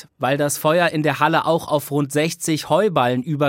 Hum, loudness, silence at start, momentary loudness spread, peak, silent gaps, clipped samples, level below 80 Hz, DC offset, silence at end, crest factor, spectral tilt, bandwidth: none; -19 LUFS; 0.2 s; 4 LU; -2 dBFS; none; under 0.1%; -64 dBFS; under 0.1%; 0 s; 18 dB; -5 dB/octave; 17 kHz